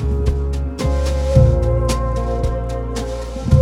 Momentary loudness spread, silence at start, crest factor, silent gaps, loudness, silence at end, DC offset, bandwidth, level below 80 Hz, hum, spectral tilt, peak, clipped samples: 10 LU; 0 s; 16 dB; none; -19 LUFS; 0 s; under 0.1%; 12 kHz; -20 dBFS; none; -7 dB/octave; 0 dBFS; under 0.1%